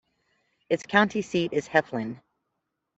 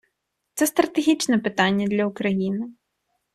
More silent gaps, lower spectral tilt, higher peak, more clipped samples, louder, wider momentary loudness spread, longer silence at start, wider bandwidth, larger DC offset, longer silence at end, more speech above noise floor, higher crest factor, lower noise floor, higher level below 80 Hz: neither; about the same, -5 dB/octave vs -4.5 dB/octave; about the same, -4 dBFS vs -4 dBFS; neither; second, -26 LUFS vs -22 LUFS; first, 12 LU vs 9 LU; first, 0.7 s vs 0.55 s; second, 8.2 kHz vs 14 kHz; neither; first, 0.8 s vs 0.65 s; about the same, 56 dB vs 56 dB; about the same, 24 dB vs 20 dB; first, -81 dBFS vs -77 dBFS; about the same, -68 dBFS vs -64 dBFS